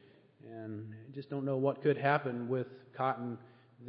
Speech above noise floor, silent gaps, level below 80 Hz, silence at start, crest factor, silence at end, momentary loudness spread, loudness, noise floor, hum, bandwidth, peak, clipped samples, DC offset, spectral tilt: 23 dB; none; -86 dBFS; 0.45 s; 22 dB; 0 s; 16 LU; -35 LUFS; -57 dBFS; none; 5.2 kHz; -14 dBFS; under 0.1%; under 0.1%; -6 dB/octave